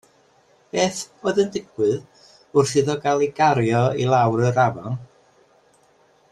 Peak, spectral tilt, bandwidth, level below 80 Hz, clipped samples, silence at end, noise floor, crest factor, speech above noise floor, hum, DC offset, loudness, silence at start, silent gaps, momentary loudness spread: -4 dBFS; -5.5 dB/octave; 12.5 kHz; -58 dBFS; under 0.1%; 1.25 s; -58 dBFS; 16 dB; 38 dB; none; under 0.1%; -21 LUFS; 0.75 s; none; 10 LU